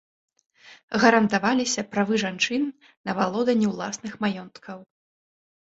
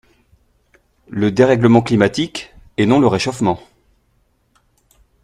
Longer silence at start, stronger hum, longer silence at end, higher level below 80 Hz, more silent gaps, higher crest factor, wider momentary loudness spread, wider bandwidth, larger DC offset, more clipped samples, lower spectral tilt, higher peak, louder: second, 0.65 s vs 1.1 s; neither; second, 0.95 s vs 1.65 s; second, -66 dBFS vs -50 dBFS; first, 0.83-0.88 s, 2.97-3.04 s vs none; first, 24 dB vs 18 dB; first, 18 LU vs 15 LU; second, 8 kHz vs 11.5 kHz; neither; neither; second, -4 dB/octave vs -6.5 dB/octave; about the same, -2 dBFS vs 0 dBFS; second, -24 LUFS vs -15 LUFS